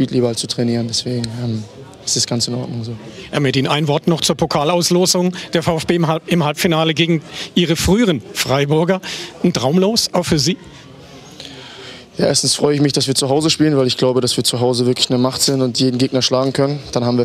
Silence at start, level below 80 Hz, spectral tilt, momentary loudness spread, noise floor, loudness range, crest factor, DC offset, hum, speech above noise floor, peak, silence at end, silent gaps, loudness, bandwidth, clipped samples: 0 s; -44 dBFS; -4.5 dB/octave; 11 LU; -38 dBFS; 4 LU; 16 dB; under 0.1%; none; 22 dB; -2 dBFS; 0 s; none; -16 LUFS; 16 kHz; under 0.1%